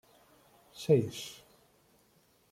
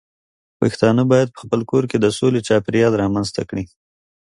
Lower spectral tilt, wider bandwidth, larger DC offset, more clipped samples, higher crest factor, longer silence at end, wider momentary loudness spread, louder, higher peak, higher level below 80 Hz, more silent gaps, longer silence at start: about the same, -6.5 dB/octave vs -6.5 dB/octave; first, 16 kHz vs 11.5 kHz; neither; neither; about the same, 22 dB vs 18 dB; first, 1.15 s vs 0.65 s; first, 25 LU vs 9 LU; second, -31 LUFS vs -18 LUFS; second, -14 dBFS vs 0 dBFS; second, -72 dBFS vs -50 dBFS; neither; first, 0.75 s vs 0.6 s